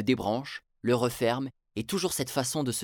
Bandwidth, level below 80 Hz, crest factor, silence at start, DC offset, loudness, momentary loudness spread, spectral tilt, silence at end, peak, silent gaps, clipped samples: 19.5 kHz; -60 dBFS; 18 dB; 0 s; under 0.1%; -30 LUFS; 9 LU; -4.5 dB/octave; 0 s; -12 dBFS; none; under 0.1%